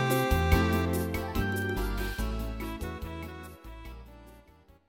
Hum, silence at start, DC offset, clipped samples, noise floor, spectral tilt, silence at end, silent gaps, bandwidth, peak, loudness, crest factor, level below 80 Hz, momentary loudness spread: none; 0 s; under 0.1%; under 0.1%; -58 dBFS; -6 dB/octave; 0.5 s; none; 17 kHz; -10 dBFS; -30 LUFS; 20 dB; -36 dBFS; 21 LU